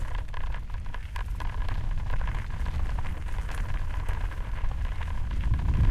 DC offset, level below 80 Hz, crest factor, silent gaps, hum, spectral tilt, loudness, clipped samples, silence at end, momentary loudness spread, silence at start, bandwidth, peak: under 0.1%; -30 dBFS; 16 dB; none; none; -6.5 dB/octave; -34 LUFS; under 0.1%; 0 s; 7 LU; 0 s; 11 kHz; -12 dBFS